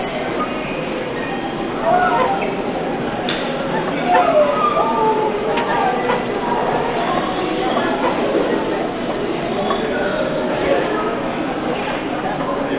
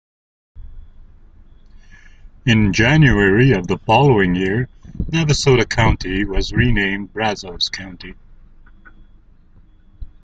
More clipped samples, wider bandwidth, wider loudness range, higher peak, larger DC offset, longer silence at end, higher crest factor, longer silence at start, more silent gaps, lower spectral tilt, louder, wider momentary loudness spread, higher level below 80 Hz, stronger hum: neither; second, 4 kHz vs 9 kHz; second, 3 LU vs 8 LU; about the same, -2 dBFS vs -2 dBFS; neither; second, 0 s vs 0.2 s; about the same, 16 dB vs 18 dB; second, 0 s vs 0.55 s; neither; first, -9.5 dB/octave vs -5.5 dB/octave; second, -19 LUFS vs -16 LUFS; second, 7 LU vs 12 LU; second, -44 dBFS vs -30 dBFS; neither